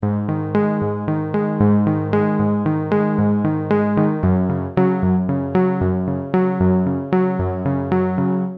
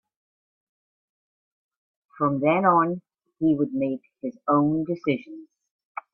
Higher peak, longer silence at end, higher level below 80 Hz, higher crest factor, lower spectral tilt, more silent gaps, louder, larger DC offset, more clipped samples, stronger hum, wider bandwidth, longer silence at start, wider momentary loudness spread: about the same, -4 dBFS vs -6 dBFS; second, 0 s vs 0.15 s; first, -44 dBFS vs -68 dBFS; second, 14 dB vs 20 dB; first, -11.5 dB/octave vs -10 dB/octave; second, none vs 5.71-5.79 s, 5.85-5.95 s; first, -19 LUFS vs -24 LUFS; neither; neither; neither; second, 4.5 kHz vs 5.2 kHz; second, 0 s vs 2.2 s; second, 4 LU vs 18 LU